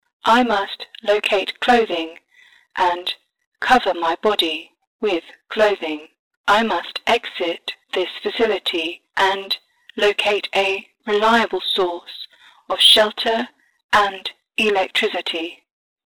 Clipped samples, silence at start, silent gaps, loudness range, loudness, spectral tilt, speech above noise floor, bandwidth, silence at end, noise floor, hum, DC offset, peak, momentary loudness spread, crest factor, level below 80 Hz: under 0.1%; 0.25 s; 3.46-3.52 s, 4.87-4.99 s, 6.19-6.31 s, 6.37-6.44 s, 13.84-13.89 s; 4 LU; -19 LUFS; -2.5 dB/octave; 34 dB; over 20 kHz; 0.5 s; -53 dBFS; none; under 0.1%; -2 dBFS; 12 LU; 18 dB; -56 dBFS